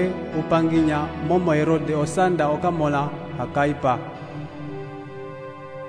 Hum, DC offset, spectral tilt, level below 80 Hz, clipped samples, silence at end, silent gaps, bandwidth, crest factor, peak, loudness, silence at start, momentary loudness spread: none; under 0.1%; -7 dB/octave; -48 dBFS; under 0.1%; 0 s; none; 10.5 kHz; 16 dB; -6 dBFS; -22 LUFS; 0 s; 16 LU